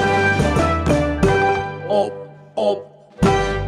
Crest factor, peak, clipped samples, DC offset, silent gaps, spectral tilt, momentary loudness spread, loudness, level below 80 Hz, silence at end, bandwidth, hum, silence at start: 14 dB; -4 dBFS; under 0.1%; under 0.1%; none; -6 dB/octave; 9 LU; -18 LUFS; -32 dBFS; 0 s; 14 kHz; none; 0 s